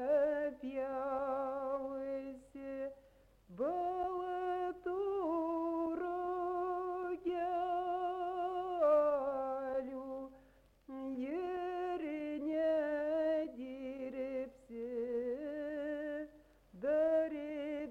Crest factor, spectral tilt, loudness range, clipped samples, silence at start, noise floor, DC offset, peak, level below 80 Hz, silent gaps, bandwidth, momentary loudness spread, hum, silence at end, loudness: 16 dB; -6.5 dB/octave; 5 LU; under 0.1%; 0 s; -66 dBFS; under 0.1%; -20 dBFS; -70 dBFS; none; 7.4 kHz; 11 LU; none; 0 s; -38 LUFS